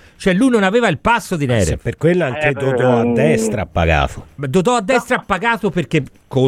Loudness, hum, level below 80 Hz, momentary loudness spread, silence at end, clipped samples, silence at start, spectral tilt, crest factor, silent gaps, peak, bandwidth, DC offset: -16 LUFS; none; -34 dBFS; 6 LU; 0 s; under 0.1%; 0.2 s; -6 dB/octave; 14 dB; none; -2 dBFS; 15.5 kHz; under 0.1%